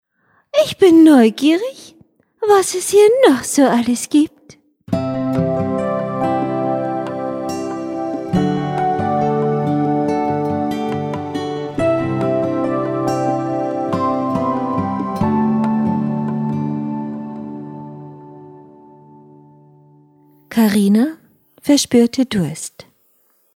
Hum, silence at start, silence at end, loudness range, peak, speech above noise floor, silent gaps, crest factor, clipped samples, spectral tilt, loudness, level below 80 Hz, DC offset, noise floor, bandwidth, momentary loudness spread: none; 0.55 s; 0.75 s; 9 LU; 0 dBFS; 47 dB; none; 18 dB; under 0.1%; -5.5 dB/octave; -17 LUFS; -52 dBFS; under 0.1%; -60 dBFS; 16 kHz; 11 LU